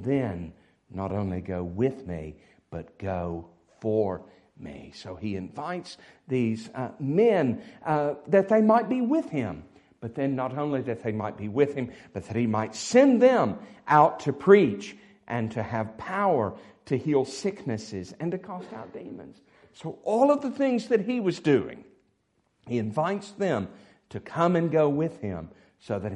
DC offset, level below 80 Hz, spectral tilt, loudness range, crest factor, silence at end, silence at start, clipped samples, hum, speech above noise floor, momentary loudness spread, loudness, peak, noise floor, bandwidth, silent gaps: under 0.1%; -64 dBFS; -7 dB/octave; 11 LU; 22 dB; 0 s; 0 s; under 0.1%; none; 46 dB; 20 LU; -26 LUFS; -4 dBFS; -72 dBFS; 11 kHz; none